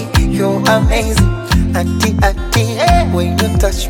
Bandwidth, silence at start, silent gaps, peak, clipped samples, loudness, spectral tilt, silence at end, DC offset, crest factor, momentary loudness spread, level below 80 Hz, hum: 19 kHz; 0 s; none; 0 dBFS; under 0.1%; -13 LUFS; -5.5 dB/octave; 0 s; under 0.1%; 12 dB; 3 LU; -18 dBFS; none